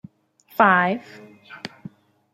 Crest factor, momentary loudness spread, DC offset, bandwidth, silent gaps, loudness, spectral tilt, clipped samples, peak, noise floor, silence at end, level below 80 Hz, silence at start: 22 dB; 21 LU; under 0.1%; 15.5 kHz; none; -19 LUFS; -6.5 dB/octave; under 0.1%; -2 dBFS; -55 dBFS; 0.65 s; -72 dBFS; 0.6 s